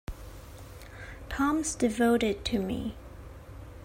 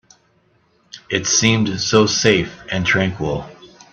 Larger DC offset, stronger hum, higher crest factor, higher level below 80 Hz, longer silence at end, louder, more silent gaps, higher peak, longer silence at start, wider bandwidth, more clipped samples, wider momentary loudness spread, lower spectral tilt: neither; neither; about the same, 18 dB vs 20 dB; about the same, -46 dBFS vs -48 dBFS; second, 0 s vs 0.25 s; second, -29 LUFS vs -17 LUFS; neither; second, -14 dBFS vs 0 dBFS; second, 0.1 s vs 0.95 s; first, 16 kHz vs 8.4 kHz; neither; first, 22 LU vs 10 LU; about the same, -4.5 dB/octave vs -3.5 dB/octave